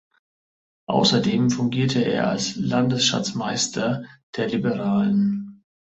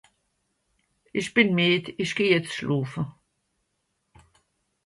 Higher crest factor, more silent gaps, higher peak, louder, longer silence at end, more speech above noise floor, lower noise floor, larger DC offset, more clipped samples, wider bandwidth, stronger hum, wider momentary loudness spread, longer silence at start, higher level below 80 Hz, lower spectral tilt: second, 16 dB vs 22 dB; first, 4.23-4.33 s vs none; about the same, -6 dBFS vs -6 dBFS; about the same, -22 LUFS vs -24 LUFS; second, 0.4 s vs 1.75 s; first, over 69 dB vs 52 dB; first, under -90 dBFS vs -76 dBFS; neither; neither; second, 8.2 kHz vs 11.5 kHz; neither; second, 10 LU vs 13 LU; second, 0.9 s vs 1.15 s; first, -58 dBFS vs -64 dBFS; about the same, -4.5 dB/octave vs -5.5 dB/octave